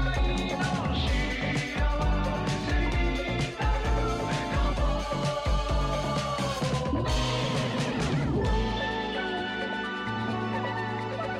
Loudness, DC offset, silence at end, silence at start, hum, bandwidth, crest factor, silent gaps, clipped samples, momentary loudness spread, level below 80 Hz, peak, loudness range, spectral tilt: -29 LUFS; under 0.1%; 0 s; 0 s; none; 11.5 kHz; 12 dB; none; under 0.1%; 3 LU; -32 dBFS; -16 dBFS; 1 LU; -5.5 dB/octave